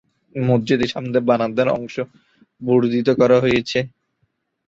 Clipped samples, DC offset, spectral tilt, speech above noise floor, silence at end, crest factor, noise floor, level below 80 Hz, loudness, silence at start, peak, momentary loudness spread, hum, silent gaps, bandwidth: under 0.1%; under 0.1%; -7 dB/octave; 51 dB; 0.8 s; 18 dB; -69 dBFS; -52 dBFS; -18 LUFS; 0.35 s; -2 dBFS; 15 LU; none; none; 7.8 kHz